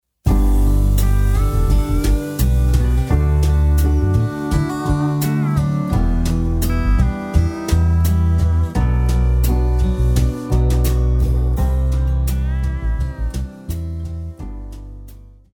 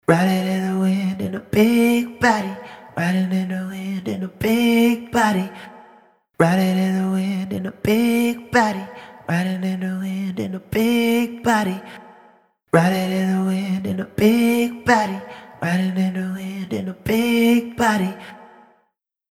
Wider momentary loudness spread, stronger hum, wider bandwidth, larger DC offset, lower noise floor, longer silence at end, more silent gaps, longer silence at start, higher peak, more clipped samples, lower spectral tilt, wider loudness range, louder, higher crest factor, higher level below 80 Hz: about the same, 10 LU vs 11 LU; neither; first, 18.5 kHz vs 16 kHz; neither; second, -39 dBFS vs -70 dBFS; second, 0.35 s vs 0.85 s; neither; first, 0.25 s vs 0.1 s; about the same, -2 dBFS vs -2 dBFS; neither; about the same, -7 dB/octave vs -6 dB/octave; about the same, 4 LU vs 2 LU; about the same, -18 LUFS vs -20 LUFS; about the same, 14 dB vs 18 dB; first, -18 dBFS vs -52 dBFS